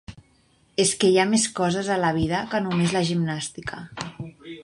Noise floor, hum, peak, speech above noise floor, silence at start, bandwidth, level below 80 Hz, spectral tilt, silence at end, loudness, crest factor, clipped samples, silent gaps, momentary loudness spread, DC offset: -61 dBFS; none; -6 dBFS; 38 dB; 0.1 s; 11.5 kHz; -50 dBFS; -4.5 dB/octave; 0 s; -22 LUFS; 18 dB; under 0.1%; none; 16 LU; under 0.1%